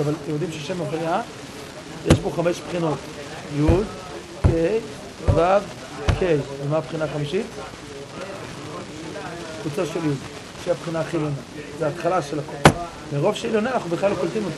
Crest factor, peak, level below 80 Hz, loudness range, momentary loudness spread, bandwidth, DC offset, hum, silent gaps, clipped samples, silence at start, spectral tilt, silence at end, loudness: 24 dB; 0 dBFS; -36 dBFS; 7 LU; 14 LU; 13 kHz; under 0.1%; none; none; under 0.1%; 0 s; -6 dB/octave; 0 s; -24 LUFS